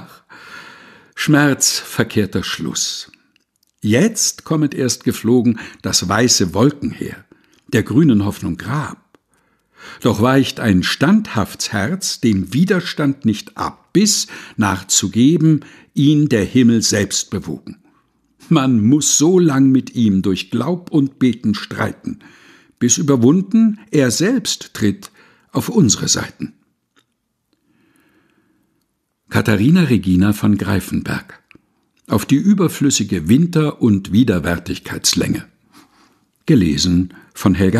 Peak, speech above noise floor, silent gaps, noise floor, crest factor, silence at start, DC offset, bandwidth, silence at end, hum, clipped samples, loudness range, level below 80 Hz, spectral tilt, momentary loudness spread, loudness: 0 dBFS; 55 dB; none; -70 dBFS; 16 dB; 0 s; under 0.1%; 14.5 kHz; 0 s; none; under 0.1%; 4 LU; -46 dBFS; -4.5 dB/octave; 12 LU; -16 LUFS